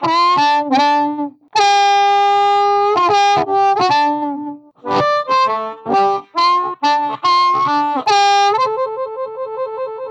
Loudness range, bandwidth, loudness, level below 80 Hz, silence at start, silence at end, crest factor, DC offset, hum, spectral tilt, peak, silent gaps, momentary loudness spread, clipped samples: 3 LU; 9 kHz; -15 LUFS; -64 dBFS; 0 s; 0 s; 10 dB; under 0.1%; none; -3 dB/octave; -4 dBFS; none; 11 LU; under 0.1%